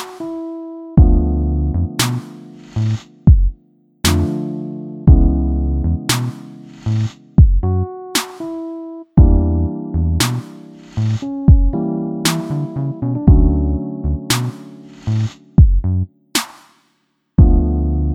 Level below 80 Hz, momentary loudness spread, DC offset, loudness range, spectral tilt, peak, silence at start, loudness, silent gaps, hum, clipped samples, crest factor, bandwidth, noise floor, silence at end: -18 dBFS; 15 LU; under 0.1%; 2 LU; -6 dB/octave; 0 dBFS; 0 s; -17 LUFS; none; none; under 0.1%; 16 dB; 16.5 kHz; -65 dBFS; 0 s